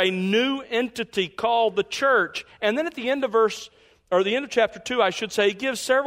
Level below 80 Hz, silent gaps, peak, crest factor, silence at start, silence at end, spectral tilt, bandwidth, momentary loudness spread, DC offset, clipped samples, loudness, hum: -64 dBFS; none; -6 dBFS; 16 dB; 0 s; 0 s; -3.5 dB/octave; 16 kHz; 6 LU; under 0.1%; under 0.1%; -23 LUFS; none